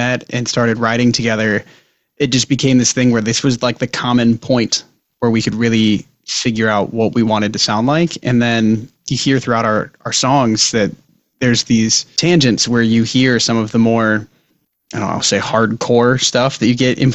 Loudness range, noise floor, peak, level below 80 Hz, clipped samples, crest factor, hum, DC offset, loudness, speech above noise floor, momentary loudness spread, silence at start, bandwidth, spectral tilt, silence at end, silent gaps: 2 LU; -63 dBFS; 0 dBFS; -46 dBFS; under 0.1%; 14 dB; none; under 0.1%; -14 LUFS; 49 dB; 6 LU; 0 s; 8.4 kHz; -4.5 dB/octave; 0 s; none